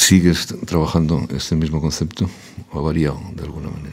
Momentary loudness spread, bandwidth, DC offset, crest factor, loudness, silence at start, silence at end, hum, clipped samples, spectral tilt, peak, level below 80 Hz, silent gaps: 13 LU; 16 kHz; under 0.1%; 18 dB; -20 LUFS; 0 s; 0 s; none; under 0.1%; -4.5 dB/octave; 0 dBFS; -34 dBFS; none